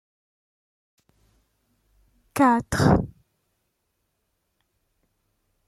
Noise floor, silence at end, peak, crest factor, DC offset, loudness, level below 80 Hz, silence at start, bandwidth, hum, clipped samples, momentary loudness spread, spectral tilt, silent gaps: -76 dBFS; 2.6 s; -6 dBFS; 24 dB; under 0.1%; -21 LUFS; -46 dBFS; 2.35 s; 16 kHz; none; under 0.1%; 14 LU; -6.5 dB/octave; none